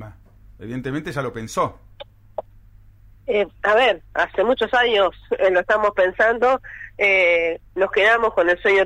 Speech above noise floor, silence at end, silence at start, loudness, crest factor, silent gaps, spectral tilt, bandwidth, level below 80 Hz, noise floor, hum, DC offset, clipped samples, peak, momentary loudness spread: 29 dB; 0 s; 0 s; -19 LUFS; 14 dB; none; -4.5 dB/octave; 13.5 kHz; -48 dBFS; -48 dBFS; none; under 0.1%; under 0.1%; -6 dBFS; 16 LU